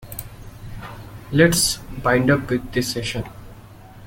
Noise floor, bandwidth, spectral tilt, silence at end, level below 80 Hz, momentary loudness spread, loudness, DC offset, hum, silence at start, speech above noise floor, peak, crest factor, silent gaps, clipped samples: -42 dBFS; 17 kHz; -4 dB/octave; 0 s; -40 dBFS; 22 LU; -20 LUFS; under 0.1%; none; 0 s; 23 dB; -2 dBFS; 20 dB; none; under 0.1%